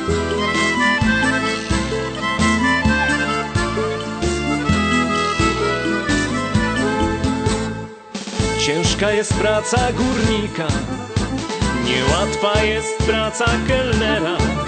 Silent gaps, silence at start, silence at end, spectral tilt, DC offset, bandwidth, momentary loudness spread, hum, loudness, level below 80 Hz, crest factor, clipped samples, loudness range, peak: none; 0 s; 0 s; -4.5 dB/octave; under 0.1%; 9.2 kHz; 6 LU; none; -18 LUFS; -30 dBFS; 16 dB; under 0.1%; 2 LU; -2 dBFS